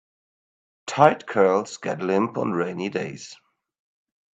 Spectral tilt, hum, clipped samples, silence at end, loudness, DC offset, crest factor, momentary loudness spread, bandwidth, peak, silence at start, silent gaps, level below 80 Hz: -5.5 dB/octave; none; under 0.1%; 1 s; -23 LUFS; under 0.1%; 24 dB; 17 LU; 9 kHz; 0 dBFS; 0.85 s; none; -70 dBFS